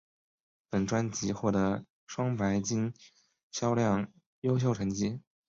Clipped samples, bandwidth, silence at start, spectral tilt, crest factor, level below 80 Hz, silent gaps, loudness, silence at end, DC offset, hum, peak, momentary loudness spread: under 0.1%; 7.6 kHz; 0.7 s; -6 dB/octave; 16 dB; -58 dBFS; 1.90-2.07 s, 3.43-3.50 s, 4.26-4.42 s; -31 LUFS; 0.3 s; under 0.1%; none; -16 dBFS; 8 LU